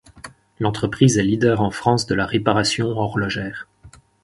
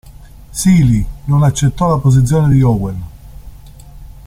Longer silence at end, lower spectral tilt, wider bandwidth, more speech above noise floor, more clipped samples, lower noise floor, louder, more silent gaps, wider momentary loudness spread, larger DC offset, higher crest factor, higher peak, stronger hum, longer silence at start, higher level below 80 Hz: first, 0.35 s vs 0.15 s; second, -5 dB/octave vs -7 dB/octave; second, 11.5 kHz vs 15 kHz; first, 29 dB vs 25 dB; neither; first, -48 dBFS vs -36 dBFS; second, -19 LUFS vs -13 LUFS; neither; second, 10 LU vs 13 LU; neither; first, 20 dB vs 12 dB; about the same, 0 dBFS vs -2 dBFS; neither; about the same, 0.15 s vs 0.05 s; second, -46 dBFS vs -30 dBFS